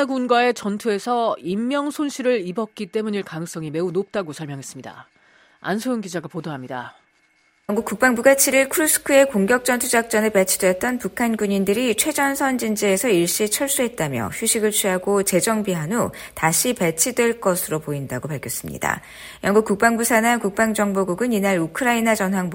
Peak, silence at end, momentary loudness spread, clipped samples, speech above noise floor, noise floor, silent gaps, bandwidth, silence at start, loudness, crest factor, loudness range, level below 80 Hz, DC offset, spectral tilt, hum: -2 dBFS; 0 s; 12 LU; under 0.1%; 41 dB; -61 dBFS; none; 17 kHz; 0 s; -20 LUFS; 20 dB; 10 LU; -56 dBFS; under 0.1%; -3.5 dB/octave; none